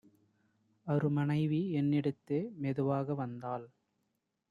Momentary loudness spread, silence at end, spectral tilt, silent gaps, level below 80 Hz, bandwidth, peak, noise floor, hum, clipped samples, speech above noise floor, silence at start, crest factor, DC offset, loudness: 10 LU; 0.85 s; -10 dB/octave; none; -74 dBFS; 5 kHz; -20 dBFS; -82 dBFS; none; under 0.1%; 49 dB; 0.85 s; 16 dB; under 0.1%; -34 LUFS